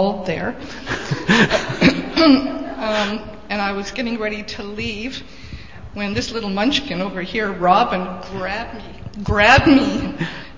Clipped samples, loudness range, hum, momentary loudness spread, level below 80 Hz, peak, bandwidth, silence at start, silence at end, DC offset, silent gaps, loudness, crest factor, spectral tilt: under 0.1%; 7 LU; none; 16 LU; -38 dBFS; 0 dBFS; 7.6 kHz; 0 s; 0 s; 1%; none; -18 LUFS; 20 dB; -5 dB/octave